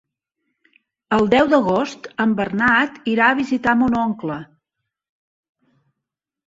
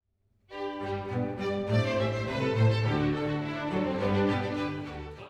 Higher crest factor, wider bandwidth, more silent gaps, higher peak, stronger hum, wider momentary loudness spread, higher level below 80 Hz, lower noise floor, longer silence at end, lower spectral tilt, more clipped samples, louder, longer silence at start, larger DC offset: about the same, 18 dB vs 16 dB; about the same, 7.8 kHz vs 8.4 kHz; neither; first, -2 dBFS vs -14 dBFS; neither; about the same, 10 LU vs 11 LU; about the same, -52 dBFS vs -52 dBFS; first, -83 dBFS vs -69 dBFS; first, 2 s vs 0 s; second, -6 dB/octave vs -7.5 dB/octave; neither; first, -18 LUFS vs -30 LUFS; first, 1.1 s vs 0.5 s; neither